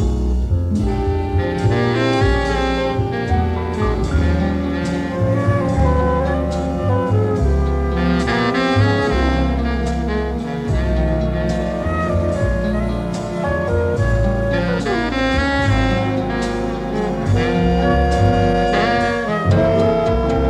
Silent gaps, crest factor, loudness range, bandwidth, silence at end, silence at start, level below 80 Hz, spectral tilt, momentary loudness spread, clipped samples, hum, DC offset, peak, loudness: none; 14 dB; 3 LU; 10.5 kHz; 0 s; 0 s; -24 dBFS; -7 dB/octave; 5 LU; under 0.1%; none; under 0.1%; -2 dBFS; -18 LUFS